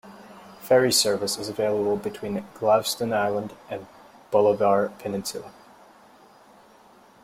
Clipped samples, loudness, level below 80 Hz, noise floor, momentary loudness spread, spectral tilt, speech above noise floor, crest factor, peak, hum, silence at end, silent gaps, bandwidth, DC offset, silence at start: under 0.1%; -24 LUFS; -64 dBFS; -53 dBFS; 16 LU; -3.5 dB/octave; 30 dB; 18 dB; -6 dBFS; none; 1.7 s; none; 16.5 kHz; under 0.1%; 0.05 s